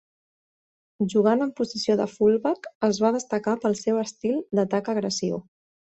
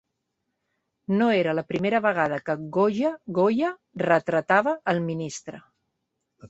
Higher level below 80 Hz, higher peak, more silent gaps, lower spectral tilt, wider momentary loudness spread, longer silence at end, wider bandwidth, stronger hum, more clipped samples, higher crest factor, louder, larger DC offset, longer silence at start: about the same, -66 dBFS vs -66 dBFS; second, -8 dBFS vs -4 dBFS; first, 2.75-2.81 s vs none; about the same, -5.5 dB/octave vs -6 dB/octave; second, 6 LU vs 9 LU; first, 0.55 s vs 0.05 s; about the same, 8.2 kHz vs 8.2 kHz; neither; neither; about the same, 16 dB vs 20 dB; about the same, -24 LUFS vs -24 LUFS; neither; about the same, 1 s vs 1.1 s